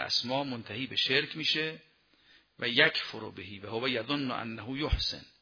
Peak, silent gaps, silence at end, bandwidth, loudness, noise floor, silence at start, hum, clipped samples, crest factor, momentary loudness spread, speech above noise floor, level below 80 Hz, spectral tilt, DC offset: -8 dBFS; none; 0.15 s; 5.4 kHz; -30 LUFS; -64 dBFS; 0 s; none; under 0.1%; 24 dB; 14 LU; 32 dB; -46 dBFS; -4 dB/octave; under 0.1%